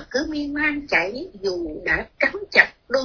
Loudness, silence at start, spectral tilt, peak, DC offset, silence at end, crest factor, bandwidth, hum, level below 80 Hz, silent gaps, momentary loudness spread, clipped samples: -21 LUFS; 0 s; -4 dB/octave; 0 dBFS; under 0.1%; 0 s; 22 dB; 5.4 kHz; none; -46 dBFS; none; 11 LU; under 0.1%